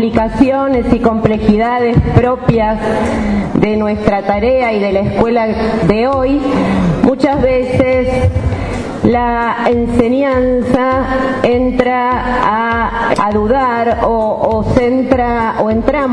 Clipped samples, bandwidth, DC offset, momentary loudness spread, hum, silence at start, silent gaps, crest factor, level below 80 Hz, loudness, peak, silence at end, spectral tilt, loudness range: 0.1%; 10.5 kHz; under 0.1%; 3 LU; none; 0 s; none; 12 dB; -26 dBFS; -13 LUFS; 0 dBFS; 0 s; -8 dB/octave; 1 LU